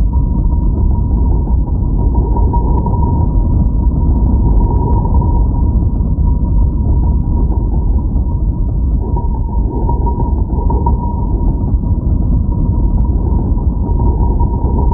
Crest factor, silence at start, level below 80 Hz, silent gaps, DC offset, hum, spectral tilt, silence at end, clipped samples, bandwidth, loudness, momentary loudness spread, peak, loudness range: 12 dB; 0 s; -12 dBFS; none; under 0.1%; none; -15.5 dB/octave; 0 s; under 0.1%; 1.3 kHz; -15 LUFS; 3 LU; 0 dBFS; 2 LU